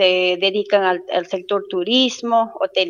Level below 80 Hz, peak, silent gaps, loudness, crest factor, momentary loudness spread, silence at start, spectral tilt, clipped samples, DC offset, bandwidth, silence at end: -74 dBFS; -2 dBFS; none; -18 LUFS; 16 dB; 6 LU; 0 s; -3.5 dB/octave; under 0.1%; under 0.1%; 9.8 kHz; 0 s